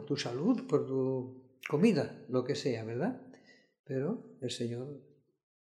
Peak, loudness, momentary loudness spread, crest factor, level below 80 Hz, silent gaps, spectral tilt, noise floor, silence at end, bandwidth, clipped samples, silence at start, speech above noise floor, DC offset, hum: -14 dBFS; -34 LUFS; 15 LU; 20 dB; -80 dBFS; 3.79-3.84 s; -6.5 dB/octave; -60 dBFS; 0.75 s; 12.5 kHz; under 0.1%; 0 s; 27 dB; under 0.1%; none